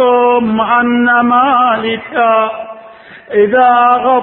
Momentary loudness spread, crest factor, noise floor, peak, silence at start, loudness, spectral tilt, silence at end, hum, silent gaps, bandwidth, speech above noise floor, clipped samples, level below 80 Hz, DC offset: 8 LU; 10 dB; -35 dBFS; 0 dBFS; 0 s; -10 LUFS; -9 dB/octave; 0 s; none; none; 4.2 kHz; 25 dB; under 0.1%; -52 dBFS; under 0.1%